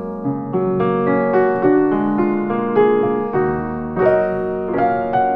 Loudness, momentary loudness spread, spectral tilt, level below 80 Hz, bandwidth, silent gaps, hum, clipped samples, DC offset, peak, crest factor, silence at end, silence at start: -17 LUFS; 7 LU; -10.5 dB/octave; -48 dBFS; 4.5 kHz; none; none; under 0.1%; under 0.1%; -4 dBFS; 14 dB; 0 s; 0 s